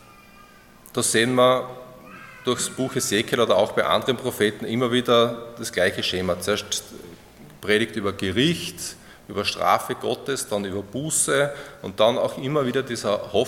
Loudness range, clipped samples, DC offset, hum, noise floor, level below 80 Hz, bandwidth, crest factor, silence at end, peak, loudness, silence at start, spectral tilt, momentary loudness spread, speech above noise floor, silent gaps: 3 LU; under 0.1%; under 0.1%; none; -49 dBFS; -60 dBFS; 17.5 kHz; 20 dB; 0 s; -4 dBFS; -23 LUFS; 0.85 s; -3.5 dB/octave; 14 LU; 26 dB; none